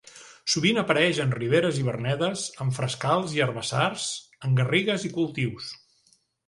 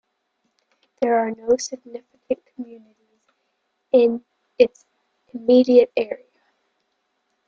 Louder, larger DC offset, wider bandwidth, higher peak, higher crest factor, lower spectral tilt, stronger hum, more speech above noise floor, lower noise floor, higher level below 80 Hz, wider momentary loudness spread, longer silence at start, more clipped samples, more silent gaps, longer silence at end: second, -25 LUFS vs -20 LUFS; neither; first, 11.5 kHz vs 7.4 kHz; second, -6 dBFS vs -2 dBFS; about the same, 20 dB vs 20 dB; about the same, -4.5 dB/octave vs -4 dB/octave; neither; second, 40 dB vs 54 dB; second, -65 dBFS vs -73 dBFS; first, -60 dBFS vs -66 dBFS; second, 10 LU vs 22 LU; second, 0.15 s vs 1 s; neither; neither; second, 0.7 s vs 1.3 s